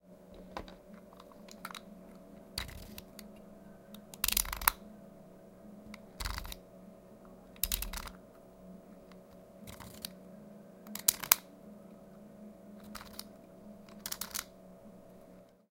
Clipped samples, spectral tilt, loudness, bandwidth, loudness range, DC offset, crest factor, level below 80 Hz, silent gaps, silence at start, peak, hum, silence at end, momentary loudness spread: under 0.1%; -1 dB/octave; -35 LUFS; 17 kHz; 13 LU; under 0.1%; 40 dB; -54 dBFS; none; 0.05 s; -2 dBFS; none; 0.1 s; 25 LU